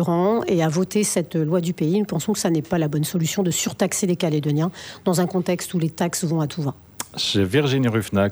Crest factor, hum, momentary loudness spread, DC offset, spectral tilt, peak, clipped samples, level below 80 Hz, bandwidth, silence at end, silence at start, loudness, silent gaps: 16 dB; none; 5 LU; under 0.1%; -5 dB/octave; -6 dBFS; under 0.1%; -56 dBFS; over 20 kHz; 0 s; 0 s; -22 LUFS; none